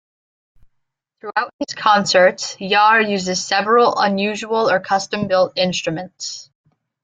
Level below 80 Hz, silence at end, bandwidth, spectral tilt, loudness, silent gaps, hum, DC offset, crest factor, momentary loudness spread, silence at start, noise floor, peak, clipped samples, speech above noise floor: -62 dBFS; 0.6 s; 9.4 kHz; -3.5 dB/octave; -17 LUFS; 1.53-1.59 s; none; under 0.1%; 16 dB; 13 LU; 1.25 s; -72 dBFS; -2 dBFS; under 0.1%; 55 dB